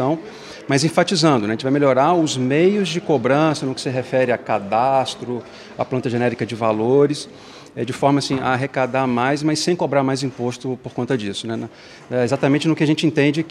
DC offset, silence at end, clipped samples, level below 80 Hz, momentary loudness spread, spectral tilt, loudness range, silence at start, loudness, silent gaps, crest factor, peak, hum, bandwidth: under 0.1%; 0 s; under 0.1%; -60 dBFS; 12 LU; -5.5 dB/octave; 4 LU; 0 s; -19 LUFS; none; 18 dB; -2 dBFS; none; 12.5 kHz